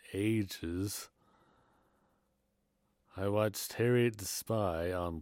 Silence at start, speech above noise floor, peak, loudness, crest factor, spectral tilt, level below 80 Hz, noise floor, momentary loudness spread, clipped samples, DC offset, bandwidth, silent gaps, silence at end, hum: 0.05 s; 45 dB; -18 dBFS; -34 LUFS; 18 dB; -5.5 dB/octave; -64 dBFS; -78 dBFS; 9 LU; under 0.1%; under 0.1%; 17 kHz; none; 0 s; none